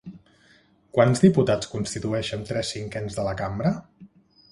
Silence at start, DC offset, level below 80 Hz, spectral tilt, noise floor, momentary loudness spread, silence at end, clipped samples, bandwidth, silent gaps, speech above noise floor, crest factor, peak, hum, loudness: 0.05 s; under 0.1%; -50 dBFS; -6 dB/octave; -58 dBFS; 13 LU; 0.45 s; under 0.1%; 11.5 kHz; none; 35 dB; 22 dB; -4 dBFS; none; -24 LUFS